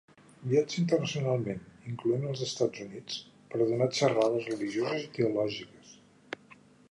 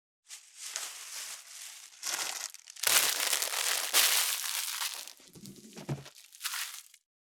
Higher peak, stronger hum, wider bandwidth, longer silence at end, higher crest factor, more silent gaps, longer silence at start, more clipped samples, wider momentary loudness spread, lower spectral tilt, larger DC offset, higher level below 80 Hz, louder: second, -12 dBFS vs -4 dBFS; neither; second, 11 kHz vs over 20 kHz; first, 1 s vs 0.4 s; second, 20 dB vs 30 dB; neither; about the same, 0.4 s vs 0.3 s; neither; second, 15 LU vs 24 LU; first, -5.5 dB/octave vs 0.5 dB/octave; neither; first, -70 dBFS vs -80 dBFS; about the same, -31 LUFS vs -30 LUFS